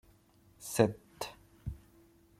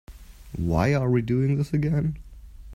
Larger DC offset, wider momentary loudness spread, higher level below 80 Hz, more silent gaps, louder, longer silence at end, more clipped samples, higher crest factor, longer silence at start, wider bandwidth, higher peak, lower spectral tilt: neither; first, 18 LU vs 10 LU; second, -56 dBFS vs -42 dBFS; neither; second, -35 LUFS vs -24 LUFS; first, 0.65 s vs 0 s; neither; first, 28 dB vs 16 dB; first, 0.6 s vs 0.1 s; first, 16 kHz vs 13 kHz; about the same, -10 dBFS vs -8 dBFS; second, -5.5 dB/octave vs -8.5 dB/octave